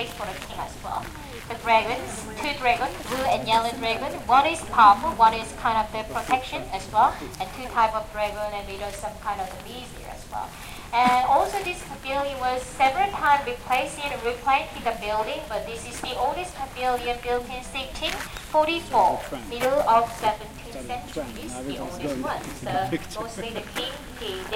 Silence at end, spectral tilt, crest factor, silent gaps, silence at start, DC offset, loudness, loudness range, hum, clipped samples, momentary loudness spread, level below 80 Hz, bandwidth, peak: 0 s; -3.5 dB/octave; 22 dB; none; 0 s; under 0.1%; -25 LUFS; 8 LU; none; under 0.1%; 14 LU; -44 dBFS; 16.5 kHz; -4 dBFS